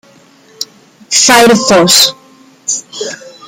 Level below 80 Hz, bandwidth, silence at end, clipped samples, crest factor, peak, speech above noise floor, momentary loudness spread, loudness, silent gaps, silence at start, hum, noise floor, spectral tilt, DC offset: -50 dBFS; over 20 kHz; 0.2 s; 0.2%; 12 dB; 0 dBFS; 35 dB; 19 LU; -7 LUFS; none; 0.6 s; none; -43 dBFS; -2 dB/octave; under 0.1%